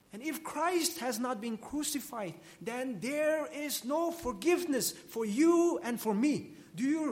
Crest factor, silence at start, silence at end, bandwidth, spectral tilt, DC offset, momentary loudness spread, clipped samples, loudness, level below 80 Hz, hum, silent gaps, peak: 16 dB; 0.15 s; 0 s; 16.5 kHz; -3.5 dB/octave; under 0.1%; 10 LU; under 0.1%; -33 LUFS; -66 dBFS; none; none; -16 dBFS